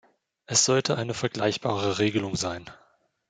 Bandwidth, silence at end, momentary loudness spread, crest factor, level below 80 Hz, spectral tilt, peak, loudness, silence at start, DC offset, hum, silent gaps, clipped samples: 10.5 kHz; 0.55 s; 9 LU; 20 dB; -62 dBFS; -3.5 dB/octave; -6 dBFS; -25 LUFS; 0.5 s; under 0.1%; none; none; under 0.1%